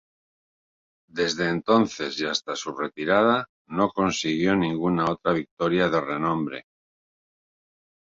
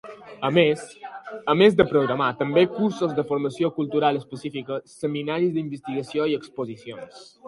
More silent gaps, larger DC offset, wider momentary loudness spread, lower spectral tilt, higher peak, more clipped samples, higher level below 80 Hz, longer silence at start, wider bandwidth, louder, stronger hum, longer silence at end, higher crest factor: first, 3.49-3.65 s, 5.51-5.57 s vs none; neither; second, 9 LU vs 18 LU; second, -5 dB/octave vs -6.5 dB/octave; second, -6 dBFS vs -2 dBFS; neither; about the same, -58 dBFS vs -60 dBFS; first, 1.15 s vs 0.05 s; second, 7.8 kHz vs 11.5 kHz; about the same, -24 LUFS vs -23 LUFS; neither; first, 1.6 s vs 0 s; about the same, 20 dB vs 20 dB